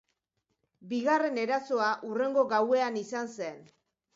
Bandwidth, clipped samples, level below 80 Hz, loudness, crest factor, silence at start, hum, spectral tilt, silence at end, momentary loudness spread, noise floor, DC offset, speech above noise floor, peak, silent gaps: 7.8 kHz; under 0.1%; -82 dBFS; -29 LUFS; 18 dB; 0.8 s; none; -4.5 dB/octave; 0.5 s; 10 LU; -82 dBFS; under 0.1%; 52 dB; -14 dBFS; none